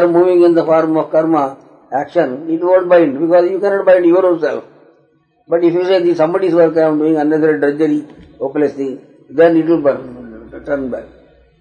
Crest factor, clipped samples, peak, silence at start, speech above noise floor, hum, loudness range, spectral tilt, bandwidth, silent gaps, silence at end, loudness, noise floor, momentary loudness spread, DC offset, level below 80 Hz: 14 dB; under 0.1%; 0 dBFS; 0 s; 43 dB; none; 3 LU; -8 dB/octave; 6.8 kHz; none; 0.55 s; -13 LUFS; -55 dBFS; 14 LU; under 0.1%; -54 dBFS